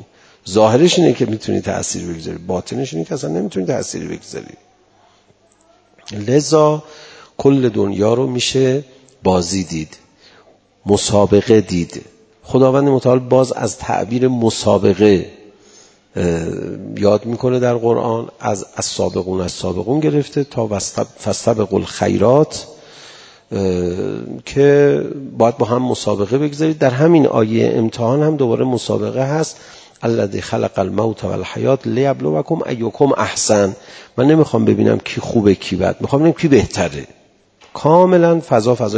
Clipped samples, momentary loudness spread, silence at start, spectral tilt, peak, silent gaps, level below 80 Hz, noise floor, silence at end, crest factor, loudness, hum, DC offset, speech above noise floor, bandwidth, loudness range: under 0.1%; 12 LU; 0 s; -6 dB/octave; 0 dBFS; none; -42 dBFS; -53 dBFS; 0 s; 16 dB; -16 LUFS; none; under 0.1%; 38 dB; 8 kHz; 5 LU